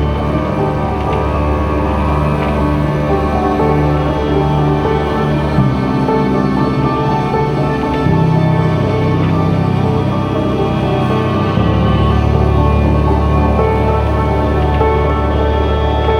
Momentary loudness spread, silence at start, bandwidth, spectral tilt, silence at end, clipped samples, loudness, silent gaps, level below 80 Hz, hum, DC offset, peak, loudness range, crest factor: 3 LU; 0 s; 10 kHz; -8.5 dB/octave; 0 s; under 0.1%; -14 LUFS; none; -20 dBFS; none; under 0.1%; 0 dBFS; 1 LU; 12 dB